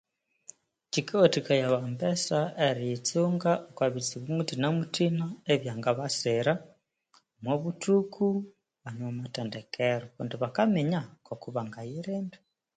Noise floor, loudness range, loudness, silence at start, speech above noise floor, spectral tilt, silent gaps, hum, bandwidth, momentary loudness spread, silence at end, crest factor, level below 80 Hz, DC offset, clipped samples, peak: -67 dBFS; 4 LU; -29 LUFS; 0.95 s; 38 dB; -5 dB/octave; none; none; 9.4 kHz; 11 LU; 0.4 s; 22 dB; -72 dBFS; under 0.1%; under 0.1%; -8 dBFS